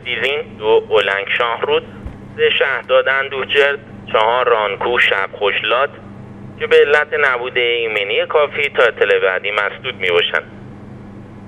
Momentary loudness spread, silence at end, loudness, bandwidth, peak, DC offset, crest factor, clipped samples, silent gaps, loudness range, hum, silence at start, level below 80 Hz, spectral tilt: 20 LU; 0 s; -15 LUFS; 9.2 kHz; 0 dBFS; under 0.1%; 16 dB; under 0.1%; none; 2 LU; none; 0 s; -48 dBFS; -4.5 dB/octave